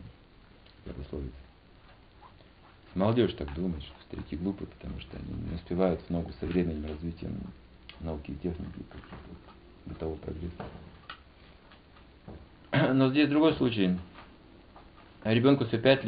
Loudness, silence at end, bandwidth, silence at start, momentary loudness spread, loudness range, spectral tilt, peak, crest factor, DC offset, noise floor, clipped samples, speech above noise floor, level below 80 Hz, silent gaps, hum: -30 LUFS; 0 s; 5 kHz; 0 s; 25 LU; 14 LU; -5.5 dB/octave; -10 dBFS; 22 dB; under 0.1%; -56 dBFS; under 0.1%; 26 dB; -48 dBFS; none; none